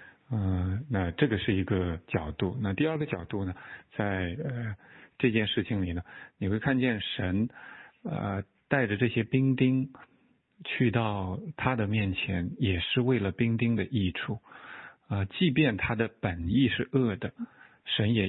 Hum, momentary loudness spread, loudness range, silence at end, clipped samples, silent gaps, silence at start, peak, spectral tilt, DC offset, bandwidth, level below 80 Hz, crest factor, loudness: none; 13 LU; 3 LU; 0 s; under 0.1%; none; 0 s; -10 dBFS; -11 dB/octave; under 0.1%; 4.2 kHz; -52 dBFS; 20 dB; -30 LUFS